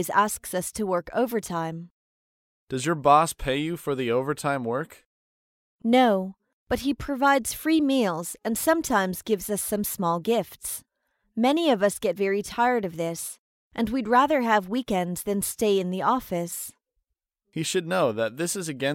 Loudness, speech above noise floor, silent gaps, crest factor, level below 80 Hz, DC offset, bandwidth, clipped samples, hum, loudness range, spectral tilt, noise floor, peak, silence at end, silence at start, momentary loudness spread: -25 LUFS; 56 dB; 1.91-2.67 s, 5.05-5.79 s, 6.53-6.67 s, 13.39-13.71 s; 20 dB; -52 dBFS; under 0.1%; 17 kHz; under 0.1%; none; 3 LU; -4.5 dB/octave; -80 dBFS; -4 dBFS; 0 s; 0 s; 12 LU